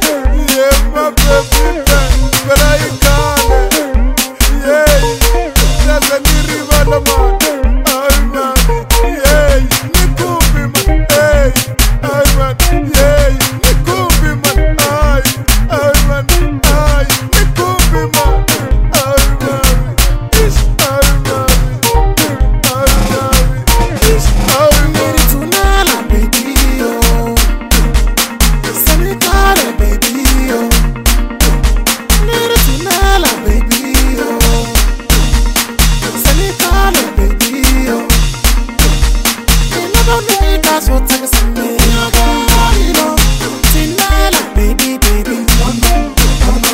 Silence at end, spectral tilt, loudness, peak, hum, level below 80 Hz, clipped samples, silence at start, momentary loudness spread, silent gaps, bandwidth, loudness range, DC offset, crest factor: 0 s; -3.5 dB/octave; -11 LUFS; 0 dBFS; none; -12 dBFS; 0.2%; 0 s; 3 LU; none; 16.5 kHz; 1 LU; 0.5%; 10 dB